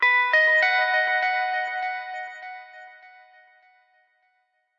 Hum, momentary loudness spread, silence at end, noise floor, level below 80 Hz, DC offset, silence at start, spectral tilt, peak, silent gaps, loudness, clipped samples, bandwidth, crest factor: none; 21 LU; 1.7 s; -71 dBFS; under -90 dBFS; under 0.1%; 0 s; 2 dB/octave; -10 dBFS; none; -21 LUFS; under 0.1%; 7.4 kHz; 16 dB